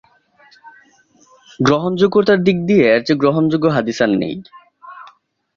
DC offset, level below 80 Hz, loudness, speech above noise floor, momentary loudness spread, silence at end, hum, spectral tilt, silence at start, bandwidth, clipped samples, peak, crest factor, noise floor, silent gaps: under 0.1%; -54 dBFS; -15 LUFS; 38 dB; 6 LU; 0.5 s; none; -6.5 dB/octave; 0.65 s; 7.4 kHz; under 0.1%; -2 dBFS; 16 dB; -53 dBFS; none